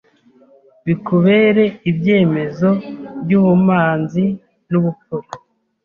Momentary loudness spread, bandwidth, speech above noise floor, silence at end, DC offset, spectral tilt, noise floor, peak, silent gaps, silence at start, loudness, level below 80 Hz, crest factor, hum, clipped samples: 16 LU; 5.4 kHz; 36 dB; 0.5 s; under 0.1%; -9 dB/octave; -51 dBFS; -2 dBFS; none; 0.85 s; -15 LUFS; -56 dBFS; 14 dB; none; under 0.1%